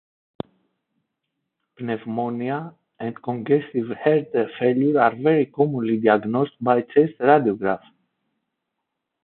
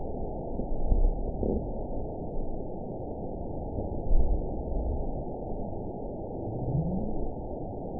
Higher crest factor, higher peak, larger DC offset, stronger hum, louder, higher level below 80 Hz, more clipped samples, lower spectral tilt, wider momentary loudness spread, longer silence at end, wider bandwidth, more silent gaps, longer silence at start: about the same, 22 dB vs 20 dB; first, -2 dBFS vs -10 dBFS; second, under 0.1% vs 0.5%; neither; first, -21 LUFS vs -34 LUFS; second, -66 dBFS vs -32 dBFS; neither; second, -11.5 dB/octave vs -17 dB/octave; first, 15 LU vs 7 LU; first, 1.5 s vs 0 s; first, 4.3 kHz vs 1 kHz; neither; first, 1.8 s vs 0 s